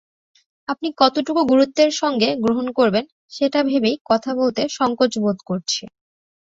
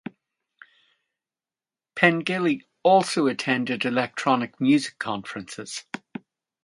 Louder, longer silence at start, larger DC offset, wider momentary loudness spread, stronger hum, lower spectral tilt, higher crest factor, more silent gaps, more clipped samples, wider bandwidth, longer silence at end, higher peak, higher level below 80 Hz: first, -19 LUFS vs -23 LUFS; second, 0.7 s vs 1.95 s; neither; second, 9 LU vs 17 LU; neither; about the same, -4.5 dB/octave vs -5 dB/octave; second, 18 dB vs 26 dB; first, 3.12-3.29 s, 4.01-4.05 s vs none; neither; second, 7.8 kHz vs 11.5 kHz; about the same, 0.7 s vs 0.7 s; about the same, -2 dBFS vs 0 dBFS; first, -60 dBFS vs -72 dBFS